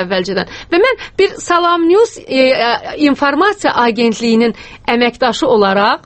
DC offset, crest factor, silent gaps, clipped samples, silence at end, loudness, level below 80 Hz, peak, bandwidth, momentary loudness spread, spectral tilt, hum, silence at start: under 0.1%; 12 dB; none; under 0.1%; 0.1 s; -13 LUFS; -46 dBFS; 0 dBFS; 8.8 kHz; 5 LU; -4.5 dB/octave; none; 0 s